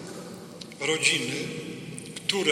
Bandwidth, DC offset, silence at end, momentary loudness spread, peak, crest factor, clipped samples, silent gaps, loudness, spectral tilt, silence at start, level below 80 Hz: 16.5 kHz; under 0.1%; 0 s; 19 LU; -6 dBFS; 22 dB; under 0.1%; none; -27 LUFS; -2.5 dB/octave; 0 s; -68 dBFS